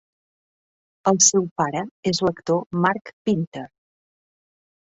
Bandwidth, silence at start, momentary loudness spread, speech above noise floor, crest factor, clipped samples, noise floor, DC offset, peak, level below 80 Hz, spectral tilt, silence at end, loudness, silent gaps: 8.4 kHz; 1.05 s; 12 LU; over 68 dB; 22 dB; under 0.1%; under -90 dBFS; under 0.1%; -2 dBFS; -60 dBFS; -3.5 dB/octave; 1.2 s; -21 LUFS; 1.51-1.56 s, 1.91-2.03 s, 2.66-2.70 s, 3.13-3.25 s, 3.47-3.52 s